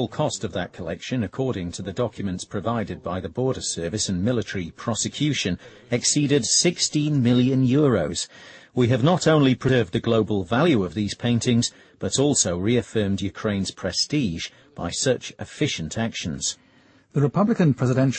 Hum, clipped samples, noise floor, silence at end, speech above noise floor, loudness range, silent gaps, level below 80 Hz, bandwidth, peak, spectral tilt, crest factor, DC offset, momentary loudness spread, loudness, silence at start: none; under 0.1%; -56 dBFS; 0 s; 34 dB; 6 LU; none; -52 dBFS; 8.8 kHz; -6 dBFS; -4.5 dB/octave; 16 dB; under 0.1%; 11 LU; -23 LUFS; 0 s